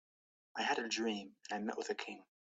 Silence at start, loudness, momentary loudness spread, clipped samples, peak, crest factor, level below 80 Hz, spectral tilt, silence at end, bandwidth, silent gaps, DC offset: 0.55 s; -40 LUFS; 13 LU; under 0.1%; -22 dBFS; 20 dB; -86 dBFS; -3 dB/octave; 0.3 s; 8.6 kHz; none; under 0.1%